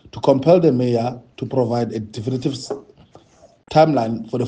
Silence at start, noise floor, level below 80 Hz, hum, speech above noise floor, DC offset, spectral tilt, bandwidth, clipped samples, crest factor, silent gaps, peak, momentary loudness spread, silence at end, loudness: 0.15 s; -51 dBFS; -56 dBFS; none; 33 dB; under 0.1%; -7.5 dB/octave; 9.4 kHz; under 0.1%; 18 dB; none; -2 dBFS; 14 LU; 0 s; -19 LUFS